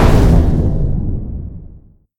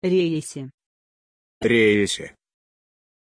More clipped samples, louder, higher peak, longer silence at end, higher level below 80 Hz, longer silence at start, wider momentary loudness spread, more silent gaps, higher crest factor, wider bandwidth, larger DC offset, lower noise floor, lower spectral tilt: neither; first, -15 LUFS vs -21 LUFS; first, 0 dBFS vs -6 dBFS; second, 0.5 s vs 0.95 s; first, -16 dBFS vs -58 dBFS; about the same, 0 s vs 0 s; about the same, 19 LU vs 21 LU; second, none vs 0.74-0.78 s, 0.86-1.61 s; about the same, 14 dB vs 18 dB; first, 14.5 kHz vs 10.5 kHz; neither; second, -41 dBFS vs under -90 dBFS; first, -8 dB/octave vs -5 dB/octave